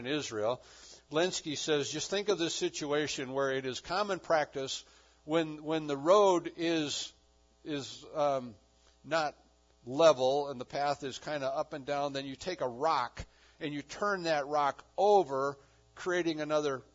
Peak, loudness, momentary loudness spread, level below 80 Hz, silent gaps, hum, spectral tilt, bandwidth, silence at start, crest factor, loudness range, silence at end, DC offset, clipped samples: -10 dBFS; -32 LUFS; 13 LU; -66 dBFS; none; none; -3 dB/octave; 7.6 kHz; 0 s; 22 dB; 4 LU; 0.15 s; under 0.1%; under 0.1%